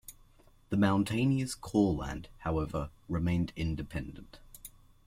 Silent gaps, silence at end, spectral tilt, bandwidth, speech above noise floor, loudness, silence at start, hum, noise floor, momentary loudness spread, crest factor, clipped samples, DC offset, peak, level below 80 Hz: none; 0.4 s; -6.5 dB/octave; 16 kHz; 29 dB; -32 LUFS; 0.1 s; none; -61 dBFS; 22 LU; 18 dB; under 0.1%; under 0.1%; -16 dBFS; -48 dBFS